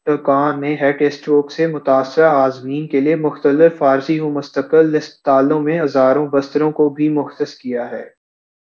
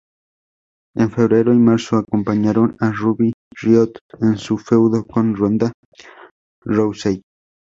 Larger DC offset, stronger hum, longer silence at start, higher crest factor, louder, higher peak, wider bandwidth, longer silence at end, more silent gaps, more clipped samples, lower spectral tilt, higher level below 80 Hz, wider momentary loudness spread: neither; neither; second, 0.05 s vs 0.95 s; about the same, 16 dB vs 16 dB; about the same, -16 LUFS vs -17 LUFS; about the same, 0 dBFS vs -2 dBFS; second, 7 kHz vs 7.8 kHz; first, 0.75 s vs 0.55 s; second, none vs 3.34-3.51 s, 4.01-4.09 s, 5.74-5.92 s, 6.31-6.62 s; neither; about the same, -7.5 dB/octave vs -8 dB/octave; second, -68 dBFS vs -52 dBFS; about the same, 10 LU vs 9 LU